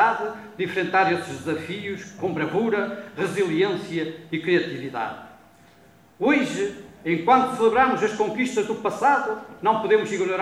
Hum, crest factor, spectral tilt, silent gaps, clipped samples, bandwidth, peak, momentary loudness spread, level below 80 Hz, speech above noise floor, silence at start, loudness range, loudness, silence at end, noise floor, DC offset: none; 18 dB; -5.5 dB/octave; none; under 0.1%; 14 kHz; -6 dBFS; 11 LU; -64 dBFS; 30 dB; 0 s; 5 LU; -23 LUFS; 0 s; -53 dBFS; under 0.1%